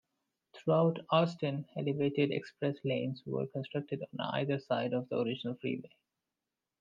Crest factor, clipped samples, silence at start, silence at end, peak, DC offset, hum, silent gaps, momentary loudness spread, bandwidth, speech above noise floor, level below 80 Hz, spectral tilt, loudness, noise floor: 18 dB; under 0.1%; 0.55 s; 0.95 s; -16 dBFS; under 0.1%; none; none; 9 LU; 7.4 kHz; 56 dB; -80 dBFS; -8 dB/octave; -34 LUFS; -90 dBFS